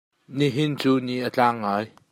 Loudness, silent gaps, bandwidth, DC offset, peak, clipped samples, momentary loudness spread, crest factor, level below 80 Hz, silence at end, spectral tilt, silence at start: -23 LUFS; none; 16 kHz; under 0.1%; -6 dBFS; under 0.1%; 6 LU; 18 dB; -70 dBFS; 0.25 s; -6.5 dB/octave; 0.3 s